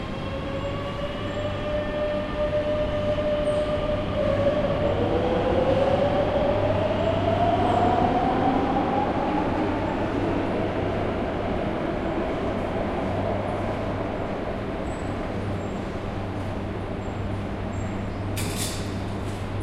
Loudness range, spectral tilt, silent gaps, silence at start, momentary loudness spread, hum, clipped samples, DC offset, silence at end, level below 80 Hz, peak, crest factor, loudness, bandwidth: 7 LU; -6.5 dB/octave; none; 0 s; 8 LU; none; under 0.1%; under 0.1%; 0 s; -38 dBFS; -10 dBFS; 16 dB; -26 LUFS; 15 kHz